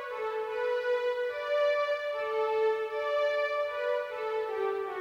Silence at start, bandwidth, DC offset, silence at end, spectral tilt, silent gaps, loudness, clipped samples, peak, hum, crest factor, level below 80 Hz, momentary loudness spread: 0 s; 15.5 kHz; under 0.1%; 0 s; -2.5 dB/octave; none; -31 LUFS; under 0.1%; -18 dBFS; none; 12 dB; -76 dBFS; 5 LU